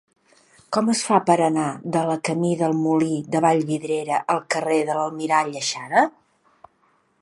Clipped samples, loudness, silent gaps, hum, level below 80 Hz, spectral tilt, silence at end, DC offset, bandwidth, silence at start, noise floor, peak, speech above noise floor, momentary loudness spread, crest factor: under 0.1%; -21 LUFS; none; none; -70 dBFS; -5 dB/octave; 1.1 s; under 0.1%; 11.5 kHz; 0.7 s; -64 dBFS; -2 dBFS; 43 dB; 6 LU; 20 dB